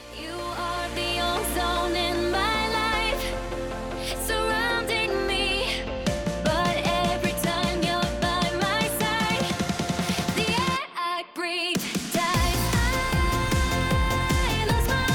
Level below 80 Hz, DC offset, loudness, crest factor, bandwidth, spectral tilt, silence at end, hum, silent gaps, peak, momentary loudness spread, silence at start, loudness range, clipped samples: -34 dBFS; under 0.1%; -25 LUFS; 16 dB; 19 kHz; -4 dB/octave; 0 s; none; none; -10 dBFS; 6 LU; 0 s; 2 LU; under 0.1%